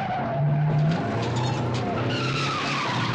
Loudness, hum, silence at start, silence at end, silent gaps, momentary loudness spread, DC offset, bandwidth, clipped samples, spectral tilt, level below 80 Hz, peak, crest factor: -25 LUFS; none; 0 s; 0 s; none; 4 LU; under 0.1%; 9 kHz; under 0.1%; -6 dB/octave; -52 dBFS; -14 dBFS; 10 dB